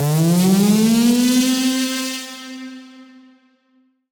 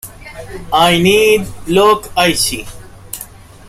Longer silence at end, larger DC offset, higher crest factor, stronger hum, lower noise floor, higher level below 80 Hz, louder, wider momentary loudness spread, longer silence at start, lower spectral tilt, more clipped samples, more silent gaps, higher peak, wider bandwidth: first, 1.1 s vs 0.45 s; neither; about the same, 12 dB vs 14 dB; neither; first, -60 dBFS vs -35 dBFS; second, -58 dBFS vs -36 dBFS; second, -16 LUFS vs -12 LUFS; second, 18 LU vs 21 LU; about the same, 0 s vs 0.05 s; first, -5 dB/octave vs -3.5 dB/octave; neither; neither; second, -6 dBFS vs 0 dBFS; first, over 20 kHz vs 16 kHz